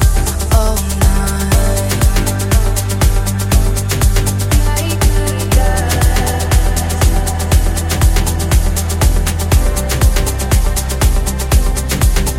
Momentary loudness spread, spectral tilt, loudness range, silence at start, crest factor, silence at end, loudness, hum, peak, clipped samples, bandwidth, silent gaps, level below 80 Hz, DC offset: 3 LU; -4.5 dB/octave; 1 LU; 0 s; 12 dB; 0 s; -14 LUFS; none; 0 dBFS; under 0.1%; 16.5 kHz; none; -14 dBFS; under 0.1%